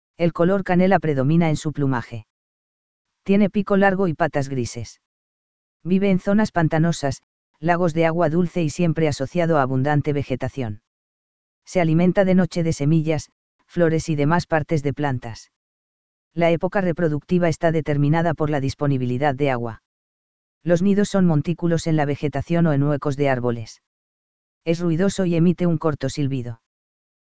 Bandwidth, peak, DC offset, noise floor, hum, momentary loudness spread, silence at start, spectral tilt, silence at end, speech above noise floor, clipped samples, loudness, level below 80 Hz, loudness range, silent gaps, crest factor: 8 kHz; -2 dBFS; 2%; under -90 dBFS; none; 11 LU; 0.15 s; -7.5 dB/octave; 0.7 s; over 70 dB; under 0.1%; -21 LUFS; -48 dBFS; 2 LU; 2.30-3.05 s, 5.06-5.80 s, 7.23-7.54 s, 10.87-11.62 s, 13.32-13.59 s, 15.56-16.31 s, 19.85-20.61 s, 23.87-24.61 s; 18 dB